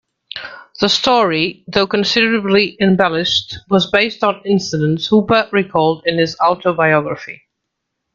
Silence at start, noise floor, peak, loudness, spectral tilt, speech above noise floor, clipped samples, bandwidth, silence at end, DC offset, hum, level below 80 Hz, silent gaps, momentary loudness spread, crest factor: 0.35 s; -76 dBFS; 0 dBFS; -15 LUFS; -5 dB/octave; 61 dB; under 0.1%; 7.6 kHz; 0.8 s; under 0.1%; none; -52 dBFS; none; 11 LU; 16 dB